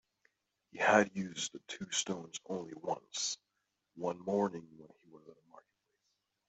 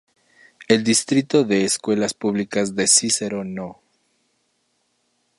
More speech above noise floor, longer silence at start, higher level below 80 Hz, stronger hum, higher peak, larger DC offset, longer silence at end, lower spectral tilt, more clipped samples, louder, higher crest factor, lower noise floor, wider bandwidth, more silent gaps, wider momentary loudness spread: about the same, 48 dB vs 49 dB; first, 0.75 s vs 0.6 s; second, -80 dBFS vs -62 dBFS; second, none vs 60 Hz at -55 dBFS; second, -14 dBFS vs 0 dBFS; neither; second, 0.9 s vs 1.65 s; about the same, -3 dB/octave vs -3 dB/octave; neither; second, -36 LUFS vs -19 LUFS; about the same, 26 dB vs 22 dB; first, -84 dBFS vs -69 dBFS; second, 8.2 kHz vs 11.5 kHz; neither; about the same, 15 LU vs 13 LU